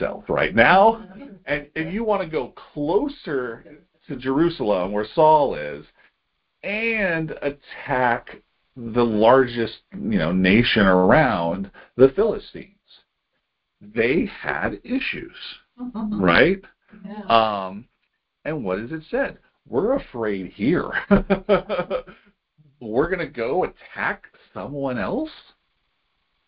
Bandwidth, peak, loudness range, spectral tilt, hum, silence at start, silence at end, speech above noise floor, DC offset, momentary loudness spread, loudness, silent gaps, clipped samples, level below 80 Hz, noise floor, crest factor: 5.6 kHz; 0 dBFS; 8 LU; -10.5 dB/octave; none; 0 s; 1.1 s; 54 dB; under 0.1%; 18 LU; -21 LUFS; none; under 0.1%; -46 dBFS; -75 dBFS; 22 dB